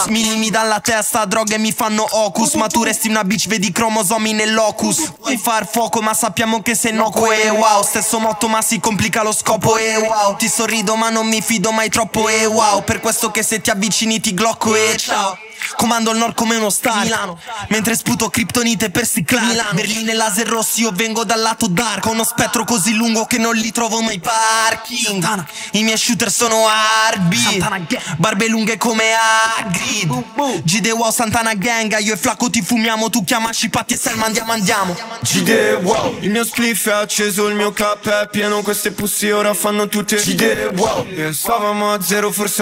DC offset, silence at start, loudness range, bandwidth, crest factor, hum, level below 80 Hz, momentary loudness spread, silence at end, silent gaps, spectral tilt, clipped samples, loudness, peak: under 0.1%; 0 s; 2 LU; 16.5 kHz; 16 dB; none; -50 dBFS; 4 LU; 0 s; none; -2.5 dB/octave; under 0.1%; -15 LUFS; 0 dBFS